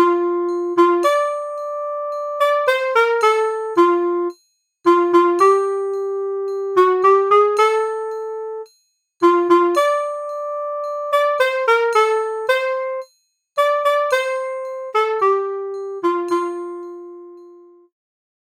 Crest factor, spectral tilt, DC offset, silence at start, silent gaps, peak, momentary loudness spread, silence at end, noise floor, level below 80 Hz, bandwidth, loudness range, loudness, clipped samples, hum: 16 dB; -3 dB/octave; under 0.1%; 0 s; none; -2 dBFS; 13 LU; 0.95 s; -63 dBFS; under -90 dBFS; 15.5 kHz; 4 LU; -18 LUFS; under 0.1%; none